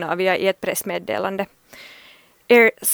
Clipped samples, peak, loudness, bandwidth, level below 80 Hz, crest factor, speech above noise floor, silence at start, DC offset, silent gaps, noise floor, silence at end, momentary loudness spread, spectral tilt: under 0.1%; -2 dBFS; -19 LUFS; over 20 kHz; -66 dBFS; 20 dB; 31 dB; 0 s; under 0.1%; none; -50 dBFS; 0 s; 15 LU; -3 dB/octave